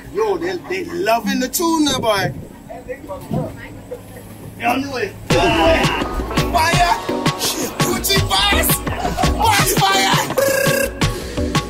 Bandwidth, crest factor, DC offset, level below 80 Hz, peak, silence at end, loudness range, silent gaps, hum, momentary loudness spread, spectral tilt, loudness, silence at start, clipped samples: 16.5 kHz; 16 dB; under 0.1%; -30 dBFS; -2 dBFS; 0 s; 7 LU; none; none; 18 LU; -3.5 dB/octave; -17 LUFS; 0 s; under 0.1%